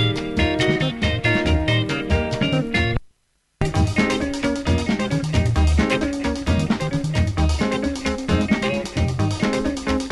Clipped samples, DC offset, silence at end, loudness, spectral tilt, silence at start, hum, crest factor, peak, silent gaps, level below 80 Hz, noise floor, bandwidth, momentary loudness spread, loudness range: under 0.1%; under 0.1%; 0 s; -21 LUFS; -6 dB/octave; 0 s; none; 16 dB; -4 dBFS; none; -28 dBFS; -65 dBFS; 11.5 kHz; 4 LU; 1 LU